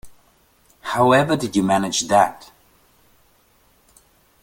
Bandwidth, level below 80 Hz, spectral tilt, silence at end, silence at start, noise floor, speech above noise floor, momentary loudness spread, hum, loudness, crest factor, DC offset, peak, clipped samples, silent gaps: 17 kHz; -56 dBFS; -4.5 dB/octave; 2 s; 0.05 s; -58 dBFS; 40 dB; 8 LU; none; -18 LUFS; 20 dB; under 0.1%; -2 dBFS; under 0.1%; none